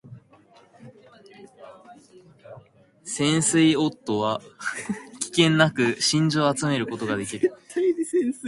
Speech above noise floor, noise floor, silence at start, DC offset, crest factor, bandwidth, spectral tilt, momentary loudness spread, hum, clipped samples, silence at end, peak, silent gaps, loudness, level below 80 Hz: 32 dB; -55 dBFS; 0.05 s; under 0.1%; 22 dB; 11.5 kHz; -4.5 dB/octave; 12 LU; none; under 0.1%; 0 s; -2 dBFS; none; -23 LUFS; -64 dBFS